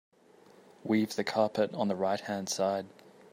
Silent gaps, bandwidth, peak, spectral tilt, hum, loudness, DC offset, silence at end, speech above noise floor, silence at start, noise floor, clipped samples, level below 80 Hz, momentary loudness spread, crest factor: none; 16 kHz; -14 dBFS; -4.5 dB/octave; none; -31 LUFS; under 0.1%; 0.45 s; 29 dB; 0.85 s; -59 dBFS; under 0.1%; -80 dBFS; 7 LU; 20 dB